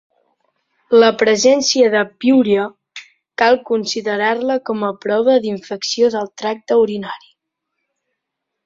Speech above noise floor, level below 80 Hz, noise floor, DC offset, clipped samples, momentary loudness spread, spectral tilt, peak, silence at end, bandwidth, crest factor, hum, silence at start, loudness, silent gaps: 63 dB; -62 dBFS; -78 dBFS; under 0.1%; under 0.1%; 14 LU; -3.5 dB/octave; -2 dBFS; 1.5 s; 7.6 kHz; 16 dB; none; 0.9 s; -16 LUFS; none